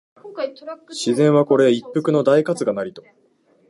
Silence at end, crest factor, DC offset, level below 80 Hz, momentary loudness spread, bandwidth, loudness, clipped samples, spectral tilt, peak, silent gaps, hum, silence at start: 0.7 s; 16 dB; under 0.1%; -70 dBFS; 17 LU; 11.5 kHz; -18 LUFS; under 0.1%; -6 dB/octave; -4 dBFS; none; none; 0.25 s